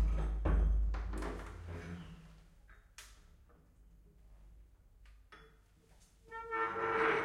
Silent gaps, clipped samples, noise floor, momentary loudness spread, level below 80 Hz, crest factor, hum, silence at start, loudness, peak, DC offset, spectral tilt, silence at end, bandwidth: none; under 0.1%; -65 dBFS; 26 LU; -40 dBFS; 18 dB; none; 0 s; -38 LUFS; -20 dBFS; under 0.1%; -6.5 dB/octave; 0 s; 10.5 kHz